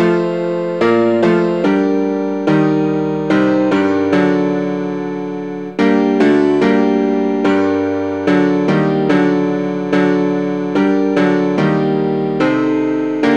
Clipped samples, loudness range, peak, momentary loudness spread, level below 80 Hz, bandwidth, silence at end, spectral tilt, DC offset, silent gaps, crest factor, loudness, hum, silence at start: under 0.1%; 1 LU; -2 dBFS; 5 LU; -58 dBFS; 7.8 kHz; 0 s; -7.5 dB/octave; 0.4%; none; 12 dB; -15 LUFS; none; 0 s